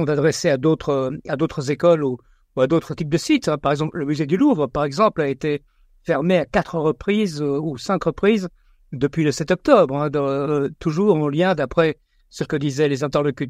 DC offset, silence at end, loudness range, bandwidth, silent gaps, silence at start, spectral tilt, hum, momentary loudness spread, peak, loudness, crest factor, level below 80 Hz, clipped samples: under 0.1%; 0 s; 2 LU; 14 kHz; none; 0 s; -6.5 dB/octave; none; 7 LU; 0 dBFS; -20 LUFS; 20 dB; -48 dBFS; under 0.1%